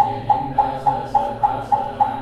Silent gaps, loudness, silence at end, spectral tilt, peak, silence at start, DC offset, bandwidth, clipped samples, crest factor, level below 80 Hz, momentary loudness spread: none; -20 LUFS; 0 s; -7 dB/octave; -4 dBFS; 0 s; under 0.1%; 10.5 kHz; under 0.1%; 16 dB; -44 dBFS; 3 LU